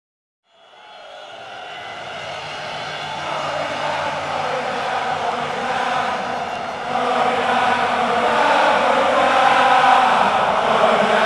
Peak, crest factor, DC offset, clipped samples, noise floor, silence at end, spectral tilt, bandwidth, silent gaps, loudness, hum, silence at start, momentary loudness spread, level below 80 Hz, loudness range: -2 dBFS; 18 dB; under 0.1%; under 0.1%; -45 dBFS; 0 s; -3.5 dB/octave; 12 kHz; none; -18 LUFS; none; 0.85 s; 16 LU; -60 dBFS; 12 LU